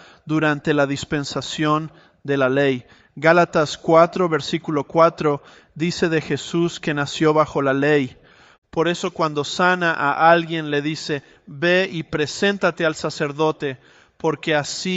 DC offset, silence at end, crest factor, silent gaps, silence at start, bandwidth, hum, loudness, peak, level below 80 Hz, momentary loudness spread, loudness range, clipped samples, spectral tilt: under 0.1%; 0 s; 18 dB; 8.58-8.62 s; 0.25 s; 8.2 kHz; none; -20 LUFS; -2 dBFS; -56 dBFS; 10 LU; 3 LU; under 0.1%; -5 dB/octave